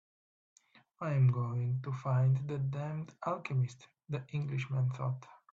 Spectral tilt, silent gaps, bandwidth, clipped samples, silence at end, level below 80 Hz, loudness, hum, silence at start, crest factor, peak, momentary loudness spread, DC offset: -8.5 dB/octave; none; 7.2 kHz; under 0.1%; 0.35 s; -70 dBFS; -35 LUFS; none; 1 s; 16 dB; -20 dBFS; 10 LU; under 0.1%